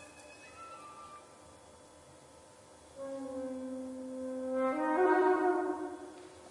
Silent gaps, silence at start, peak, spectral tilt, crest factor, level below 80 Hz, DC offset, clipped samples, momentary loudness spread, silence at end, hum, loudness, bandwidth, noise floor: none; 0 s; -18 dBFS; -5 dB/octave; 18 dB; -76 dBFS; under 0.1%; under 0.1%; 25 LU; 0 s; none; -33 LUFS; 11.5 kHz; -57 dBFS